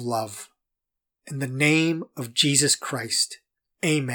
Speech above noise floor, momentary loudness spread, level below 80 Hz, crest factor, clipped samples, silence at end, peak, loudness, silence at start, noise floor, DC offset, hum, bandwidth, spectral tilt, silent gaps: 61 dB; 16 LU; -82 dBFS; 24 dB; under 0.1%; 0 s; -2 dBFS; -23 LUFS; 0 s; -85 dBFS; under 0.1%; none; 19.5 kHz; -3 dB/octave; none